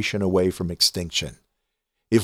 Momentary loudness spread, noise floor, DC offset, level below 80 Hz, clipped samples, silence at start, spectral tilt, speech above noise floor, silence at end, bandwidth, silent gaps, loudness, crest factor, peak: 7 LU; -79 dBFS; under 0.1%; -48 dBFS; under 0.1%; 0 s; -4 dB/octave; 55 dB; 0 s; 17 kHz; none; -22 LUFS; 18 dB; -6 dBFS